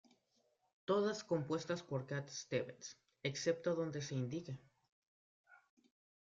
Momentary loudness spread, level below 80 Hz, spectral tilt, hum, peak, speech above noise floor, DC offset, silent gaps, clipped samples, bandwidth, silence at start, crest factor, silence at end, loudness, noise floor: 14 LU; -80 dBFS; -5 dB/octave; none; -24 dBFS; 39 dB; under 0.1%; 4.92-5.44 s; under 0.1%; 7.8 kHz; 0.9 s; 18 dB; 0.7 s; -41 LUFS; -80 dBFS